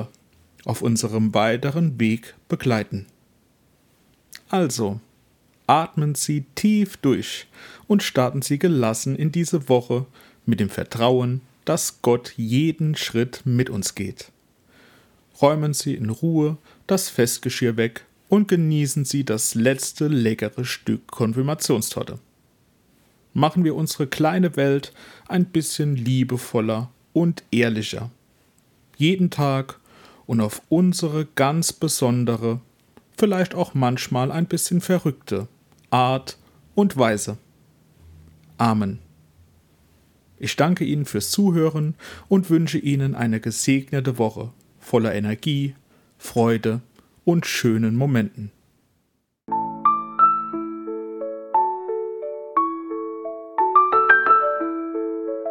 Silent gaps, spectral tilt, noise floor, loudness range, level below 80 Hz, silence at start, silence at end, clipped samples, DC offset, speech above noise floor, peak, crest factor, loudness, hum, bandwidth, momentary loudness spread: none; -5.5 dB/octave; -70 dBFS; 4 LU; -62 dBFS; 0 s; 0 s; under 0.1%; under 0.1%; 49 dB; 0 dBFS; 22 dB; -22 LUFS; none; 18 kHz; 11 LU